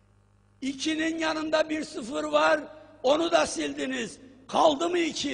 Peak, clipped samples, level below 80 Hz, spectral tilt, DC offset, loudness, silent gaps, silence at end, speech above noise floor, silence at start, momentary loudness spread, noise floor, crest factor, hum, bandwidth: -10 dBFS; under 0.1%; -62 dBFS; -3 dB/octave; under 0.1%; -27 LUFS; none; 0 s; 35 dB; 0.6 s; 11 LU; -61 dBFS; 18 dB; none; 10 kHz